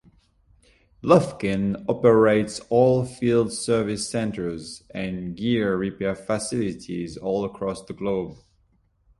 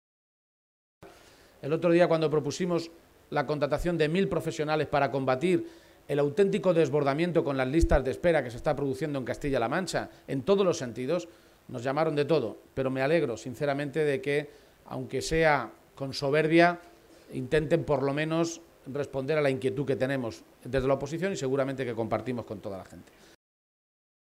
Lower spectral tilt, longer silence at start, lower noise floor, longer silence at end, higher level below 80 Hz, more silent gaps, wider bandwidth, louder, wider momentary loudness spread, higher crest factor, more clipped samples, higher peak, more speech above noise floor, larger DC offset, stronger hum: about the same, -6 dB/octave vs -6 dB/octave; about the same, 1.05 s vs 1 s; first, -64 dBFS vs -56 dBFS; second, 0.85 s vs 1.35 s; second, -52 dBFS vs -46 dBFS; neither; second, 11.5 kHz vs 15.5 kHz; first, -23 LUFS vs -28 LUFS; about the same, 12 LU vs 12 LU; about the same, 22 dB vs 20 dB; neither; first, -2 dBFS vs -10 dBFS; first, 41 dB vs 28 dB; neither; neither